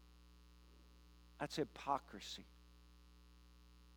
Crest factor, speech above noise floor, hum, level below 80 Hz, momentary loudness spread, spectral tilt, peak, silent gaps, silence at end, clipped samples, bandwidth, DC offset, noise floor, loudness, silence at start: 26 dB; 20 dB; 60 Hz at -65 dBFS; -66 dBFS; 23 LU; -4.5 dB/octave; -24 dBFS; none; 0 s; under 0.1%; 17 kHz; under 0.1%; -64 dBFS; -46 LUFS; 0 s